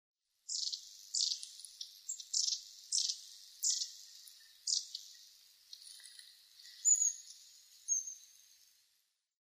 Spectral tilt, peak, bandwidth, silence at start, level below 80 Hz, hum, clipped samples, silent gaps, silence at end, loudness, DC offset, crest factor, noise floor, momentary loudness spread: 8.5 dB/octave; -18 dBFS; 15.5 kHz; 0.5 s; under -90 dBFS; none; under 0.1%; none; 1.3 s; -35 LUFS; under 0.1%; 24 dB; -79 dBFS; 21 LU